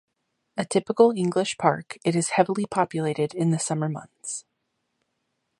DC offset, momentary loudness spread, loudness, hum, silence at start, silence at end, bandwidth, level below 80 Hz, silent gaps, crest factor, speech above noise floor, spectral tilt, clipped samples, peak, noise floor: under 0.1%; 14 LU; -24 LUFS; none; 0.55 s; 1.2 s; 11.5 kHz; -70 dBFS; none; 22 dB; 53 dB; -5 dB/octave; under 0.1%; -4 dBFS; -77 dBFS